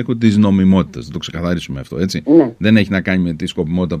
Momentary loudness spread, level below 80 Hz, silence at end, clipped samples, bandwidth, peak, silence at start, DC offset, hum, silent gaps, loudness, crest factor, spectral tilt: 11 LU; -40 dBFS; 0 s; under 0.1%; 10 kHz; 0 dBFS; 0 s; under 0.1%; none; none; -15 LUFS; 14 dB; -7 dB/octave